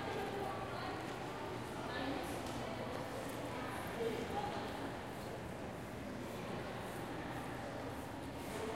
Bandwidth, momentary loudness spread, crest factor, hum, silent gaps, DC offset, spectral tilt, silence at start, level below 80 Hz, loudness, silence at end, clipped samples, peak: 16 kHz; 5 LU; 14 dB; none; none; under 0.1%; -5 dB/octave; 0 s; -60 dBFS; -44 LUFS; 0 s; under 0.1%; -28 dBFS